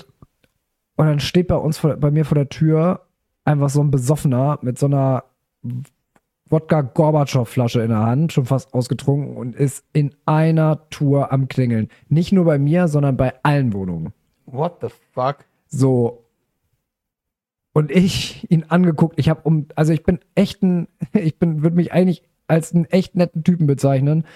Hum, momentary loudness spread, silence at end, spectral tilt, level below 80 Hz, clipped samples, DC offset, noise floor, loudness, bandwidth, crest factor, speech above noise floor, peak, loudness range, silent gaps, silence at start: none; 8 LU; 0.15 s; -7.5 dB/octave; -46 dBFS; under 0.1%; under 0.1%; -83 dBFS; -18 LUFS; 13 kHz; 16 dB; 66 dB; -2 dBFS; 4 LU; none; 1 s